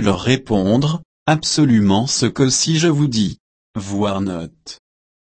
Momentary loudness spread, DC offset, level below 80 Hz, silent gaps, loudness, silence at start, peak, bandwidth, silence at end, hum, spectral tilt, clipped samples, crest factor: 15 LU; under 0.1%; -46 dBFS; 1.05-1.26 s, 3.40-3.74 s; -17 LUFS; 0 s; -2 dBFS; 8.8 kHz; 0.5 s; none; -4.5 dB/octave; under 0.1%; 16 dB